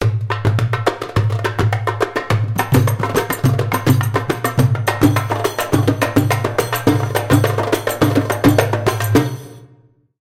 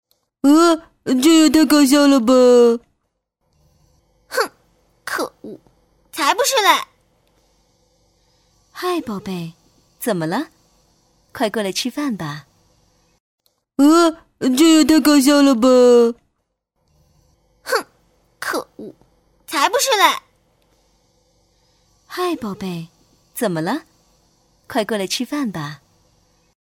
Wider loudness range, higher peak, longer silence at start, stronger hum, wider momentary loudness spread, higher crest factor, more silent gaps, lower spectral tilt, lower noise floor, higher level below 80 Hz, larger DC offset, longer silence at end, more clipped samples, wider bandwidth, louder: second, 2 LU vs 14 LU; about the same, -2 dBFS vs -2 dBFS; second, 0 s vs 0.45 s; neither; second, 4 LU vs 20 LU; about the same, 16 dB vs 18 dB; second, none vs 13.20-13.38 s; first, -6 dB/octave vs -3.5 dB/octave; second, -51 dBFS vs -72 dBFS; first, -40 dBFS vs -58 dBFS; neither; second, 0.55 s vs 0.95 s; neither; about the same, 16.5 kHz vs 16.5 kHz; about the same, -17 LUFS vs -16 LUFS